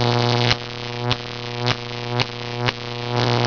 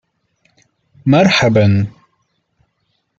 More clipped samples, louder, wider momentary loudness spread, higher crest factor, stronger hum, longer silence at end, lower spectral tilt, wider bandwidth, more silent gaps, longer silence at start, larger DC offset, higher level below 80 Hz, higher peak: neither; second, -22 LUFS vs -13 LUFS; second, 8 LU vs 11 LU; about the same, 20 dB vs 16 dB; neither; second, 0 s vs 1.3 s; about the same, -5 dB/octave vs -6 dB/octave; second, 5.4 kHz vs 7.8 kHz; neither; second, 0 s vs 1.05 s; first, 0.3% vs under 0.1%; about the same, -46 dBFS vs -50 dBFS; about the same, -2 dBFS vs 0 dBFS